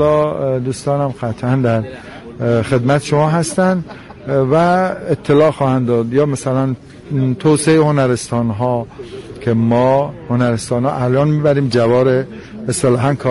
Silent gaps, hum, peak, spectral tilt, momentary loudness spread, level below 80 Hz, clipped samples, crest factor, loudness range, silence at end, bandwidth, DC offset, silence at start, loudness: none; none; -2 dBFS; -6.5 dB/octave; 10 LU; -46 dBFS; under 0.1%; 12 dB; 2 LU; 0 s; 11.5 kHz; under 0.1%; 0 s; -15 LUFS